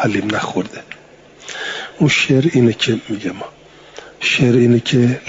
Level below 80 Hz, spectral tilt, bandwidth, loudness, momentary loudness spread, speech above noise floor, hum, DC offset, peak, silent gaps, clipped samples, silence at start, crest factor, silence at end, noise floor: -52 dBFS; -5.5 dB/octave; 7.8 kHz; -16 LUFS; 23 LU; 28 dB; none; under 0.1%; -2 dBFS; none; under 0.1%; 0 s; 14 dB; 0 s; -43 dBFS